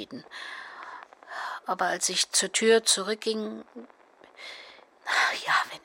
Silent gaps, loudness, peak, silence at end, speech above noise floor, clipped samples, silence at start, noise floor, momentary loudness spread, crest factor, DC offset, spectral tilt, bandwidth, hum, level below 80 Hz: none; -25 LUFS; -8 dBFS; 0.05 s; 25 dB; under 0.1%; 0 s; -52 dBFS; 21 LU; 20 dB; under 0.1%; -0.5 dB/octave; 16.5 kHz; none; -80 dBFS